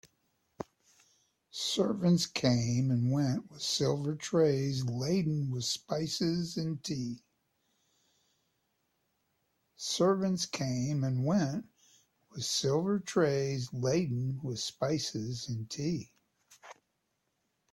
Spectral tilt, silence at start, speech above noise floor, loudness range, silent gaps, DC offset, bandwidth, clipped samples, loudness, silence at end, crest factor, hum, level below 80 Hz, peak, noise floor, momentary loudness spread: -5.5 dB/octave; 0.6 s; 49 dB; 7 LU; none; under 0.1%; 14 kHz; under 0.1%; -32 LUFS; 1 s; 20 dB; none; -68 dBFS; -14 dBFS; -81 dBFS; 10 LU